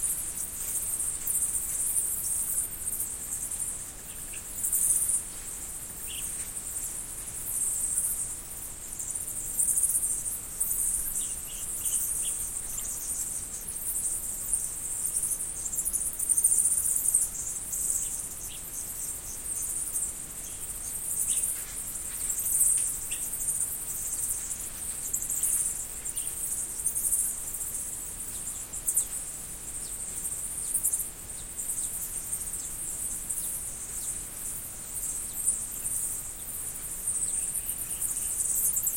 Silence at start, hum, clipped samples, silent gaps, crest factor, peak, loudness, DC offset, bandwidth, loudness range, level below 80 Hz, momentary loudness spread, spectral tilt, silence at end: 0 s; none; under 0.1%; none; 22 dB; -8 dBFS; -29 LUFS; under 0.1%; 16.5 kHz; 5 LU; -50 dBFS; 10 LU; -0.5 dB/octave; 0 s